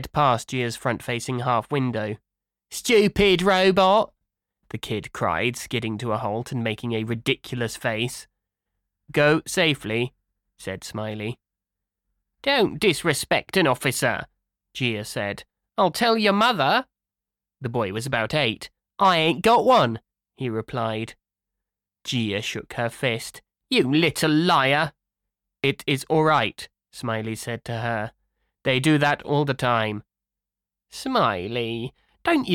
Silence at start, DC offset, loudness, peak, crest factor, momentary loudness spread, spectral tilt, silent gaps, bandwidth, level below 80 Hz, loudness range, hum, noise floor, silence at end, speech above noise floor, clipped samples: 0 s; under 0.1%; -23 LUFS; -8 dBFS; 16 dB; 15 LU; -4.5 dB/octave; none; 17.5 kHz; -54 dBFS; 6 LU; none; -89 dBFS; 0 s; 67 dB; under 0.1%